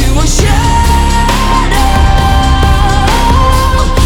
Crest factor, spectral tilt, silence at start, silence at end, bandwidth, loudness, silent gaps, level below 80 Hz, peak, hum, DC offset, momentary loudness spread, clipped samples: 8 dB; -4.5 dB/octave; 0 s; 0 s; 17.5 kHz; -9 LUFS; none; -10 dBFS; 0 dBFS; none; under 0.1%; 1 LU; 0.2%